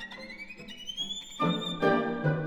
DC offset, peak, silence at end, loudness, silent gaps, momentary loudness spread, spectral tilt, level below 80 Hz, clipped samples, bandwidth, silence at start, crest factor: under 0.1%; -12 dBFS; 0 s; -30 LUFS; none; 15 LU; -5.5 dB/octave; -60 dBFS; under 0.1%; 17.5 kHz; 0 s; 18 dB